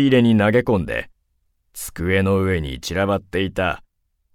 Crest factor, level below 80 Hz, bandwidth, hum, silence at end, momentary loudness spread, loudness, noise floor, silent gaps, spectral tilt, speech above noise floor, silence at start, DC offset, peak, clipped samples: 16 dB; -40 dBFS; 16.5 kHz; none; 0.6 s; 15 LU; -20 LUFS; -67 dBFS; none; -6 dB/octave; 49 dB; 0 s; under 0.1%; -4 dBFS; under 0.1%